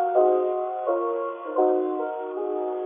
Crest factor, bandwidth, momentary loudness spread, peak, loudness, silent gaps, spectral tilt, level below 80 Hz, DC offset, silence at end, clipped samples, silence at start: 16 dB; 3.6 kHz; 9 LU; -8 dBFS; -25 LUFS; none; -2.5 dB/octave; under -90 dBFS; under 0.1%; 0 s; under 0.1%; 0 s